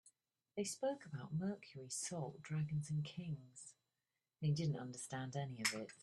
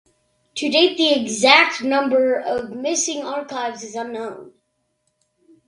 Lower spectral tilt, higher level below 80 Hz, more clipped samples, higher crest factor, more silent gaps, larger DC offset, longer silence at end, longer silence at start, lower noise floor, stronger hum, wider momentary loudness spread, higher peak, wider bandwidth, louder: first, -5 dB/octave vs -1.5 dB/octave; second, -78 dBFS vs -66 dBFS; neither; about the same, 24 dB vs 20 dB; neither; neither; second, 0 s vs 1.2 s; second, 0.05 s vs 0.55 s; first, under -90 dBFS vs -71 dBFS; neither; second, 10 LU vs 16 LU; second, -22 dBFS vs 0 dBFS; about the same, 12.5 kHz vs 11.5 kHz; second, -44 LUFS vs -18 LUFS